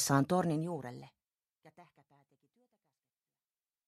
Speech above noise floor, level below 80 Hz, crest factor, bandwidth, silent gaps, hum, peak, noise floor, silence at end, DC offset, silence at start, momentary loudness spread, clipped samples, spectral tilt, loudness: over 57 dB; -74 dBFS; 24 dB; 15 kHz; none; none; -14 dBFS; under -90 dBFS; 2.05 s; under 0.1%; 0 s; 19 LU; under 0.1%; -5 dB/octave; -33 LUFS